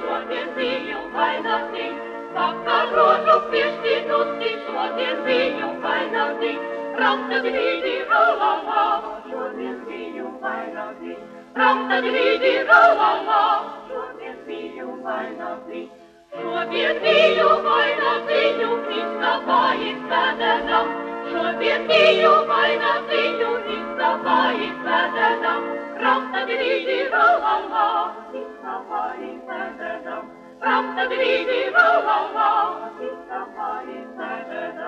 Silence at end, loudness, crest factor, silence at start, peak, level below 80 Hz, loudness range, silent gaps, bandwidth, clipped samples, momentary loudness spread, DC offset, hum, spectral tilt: 0 s; -20 LUFS; 18 dB; 0 s; -2 dBFS; -62 dBFS; 6 LU; none; 8.6 kHz; under 0.1%; 16 LU; under 0.1%; none; -4 dB/octave